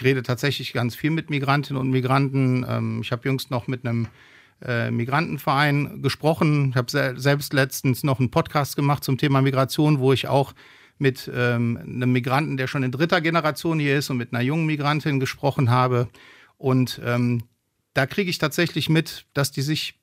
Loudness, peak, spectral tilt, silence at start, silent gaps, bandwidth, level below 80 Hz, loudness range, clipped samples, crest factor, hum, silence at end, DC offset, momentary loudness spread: -23 LUFS; -4 dBFS; -6 dB/octave; 0 s; none; 16 kHz; -60 dBFS; 3 LU; under 0.1%; 20 dB; none; 0.15 s; under 0.1%; 6 LU